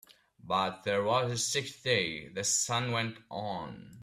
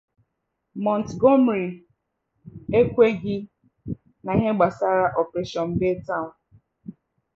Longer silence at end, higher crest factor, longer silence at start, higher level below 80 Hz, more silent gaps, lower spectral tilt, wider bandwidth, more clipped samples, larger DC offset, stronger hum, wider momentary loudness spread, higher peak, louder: second, 0 s vs 0.45 s; about the same, 20 dB vs 20 dB; second, 0.45 s vs 0.75 s; second, -68 dBFS vs -52 dBFS; neither; second, -2.5 dB/octave vs -8 dB/octave; first, 15.5 kHz vs 7.4 kHz; neither; neither; neither; second, 10 LU vs 23 LU; second, -14 dBFS vs -4 dBFS; second, -31 LUFS vs -22 LUFS